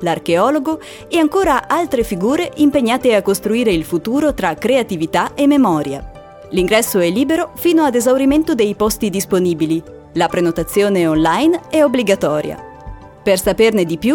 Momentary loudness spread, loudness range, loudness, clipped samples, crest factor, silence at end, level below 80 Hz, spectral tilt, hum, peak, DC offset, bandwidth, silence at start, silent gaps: 7 LU; 1 LU; -15 LUFS; under 0.1%; 14 dB; 0 s; -40 dBFS; -5 dB/octave; none; -2 dBFS; under 0.1%; 19.5 kHz; 0 s; none